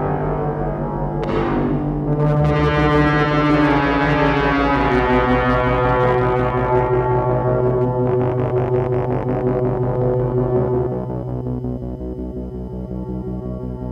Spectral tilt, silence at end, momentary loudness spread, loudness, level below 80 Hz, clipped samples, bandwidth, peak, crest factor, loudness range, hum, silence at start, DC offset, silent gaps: -9 dB/octave; 0 s; 11 LU; -18 LUFS; -30 dBFS; under 0.1%; 7 kHz; -2 dBFS; 16 dB; 6 LU; none; 0 s; under 0.1%; none